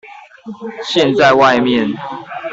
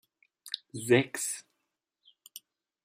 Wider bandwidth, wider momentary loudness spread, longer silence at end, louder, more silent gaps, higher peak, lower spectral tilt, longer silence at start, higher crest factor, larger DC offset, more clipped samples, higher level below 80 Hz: second, 8 kHz vs 16 kHz; second, 19 LU vs 24 LU; second, 0 s vs 0.45 s; first, -12 LUFS vs -30 LUFS; neither; first, -2 dBFS vs -12 dBFS; about the same, -5 dB/octave vs -4 dB/octave; second, 0.05 s vs 0.45 s; second, 14 dB vs 22 dB; neither; neither; first, -54 dBFS vs -78 dBFS